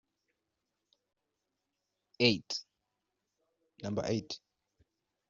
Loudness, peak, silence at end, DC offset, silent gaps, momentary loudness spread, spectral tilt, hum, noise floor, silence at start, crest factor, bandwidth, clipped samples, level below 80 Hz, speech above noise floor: -33 LUFS; -10 dBFS; 0.9 s; under 0.1%; none; 16 LU; -3.5 dB/octave; none; -86 dBFS; 2.2 s; 30 dB; 7.6 kHz; under 0.1%; -74 dBFS; 53 dB